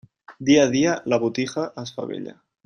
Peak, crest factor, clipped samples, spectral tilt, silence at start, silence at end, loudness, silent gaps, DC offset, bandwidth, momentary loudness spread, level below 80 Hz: -4 dBFS; 18 dB; under 0.1%; -5 dB/octave; 0.3 s; 0.35 s; -22 LUFS; none; under 0.1%; 10 kHz; 15 LU; -62 dBFS